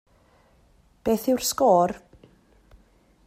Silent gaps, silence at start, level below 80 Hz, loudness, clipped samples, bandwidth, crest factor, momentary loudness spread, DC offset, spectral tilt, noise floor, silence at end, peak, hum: none; 1.05 s; -56 dBFS; -23 LUFS; under 0.1%; 16 kHz; 20 dB; 11 LU; under 0.1%; -4.5 dB/octave; -59 dBFS; 1.3 s; -6 dBFS; none